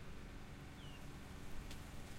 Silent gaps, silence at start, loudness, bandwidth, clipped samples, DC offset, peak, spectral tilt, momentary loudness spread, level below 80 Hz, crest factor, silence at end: none; 0 s; -54 LUFS; 16 kHz; under 0.1%; under 0.1%; -36 dBFS; -5 dB/octave; 2 LU; -54 dBFS; 14 dB; 0 s